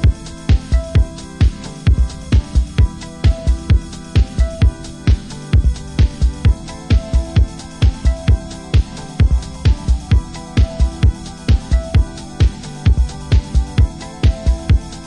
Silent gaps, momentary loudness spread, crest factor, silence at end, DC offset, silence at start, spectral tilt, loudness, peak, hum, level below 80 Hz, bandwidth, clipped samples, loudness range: none; 3 LU; 12 dB; 0 s; under 0.1%; 0 s; -6.5 dB/octave; -17 LUFS; -2 dBFS; none; -16 dBFS; 10.5 kHz; under 0.1%; 1 LU